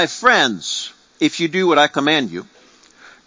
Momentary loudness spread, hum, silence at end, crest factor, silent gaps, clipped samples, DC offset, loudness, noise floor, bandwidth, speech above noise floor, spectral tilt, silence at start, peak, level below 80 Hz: 13 LU; none; 0.8 s; 18 dB; none; under 0.1%; under 0.1%; -16 LUFS; -48 dBFS; 7.6 kHz; 31 dB; -3 dB/octave; 0 s; 0 dBFS; -64 dBFS